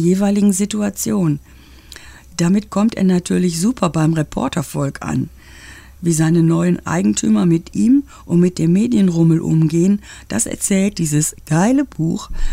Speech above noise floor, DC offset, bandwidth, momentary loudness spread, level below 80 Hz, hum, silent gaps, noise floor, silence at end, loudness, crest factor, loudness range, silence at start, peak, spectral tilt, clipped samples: 24 dB; under 0.1%; 16 kHz; 8 LU; -34 dBFS; none; none; -39 dBFS; 0 s; -17 LUFS; 14 dB; 3 LU; 0 s; -2 dBFS; -6 dB/octave; under 0.1%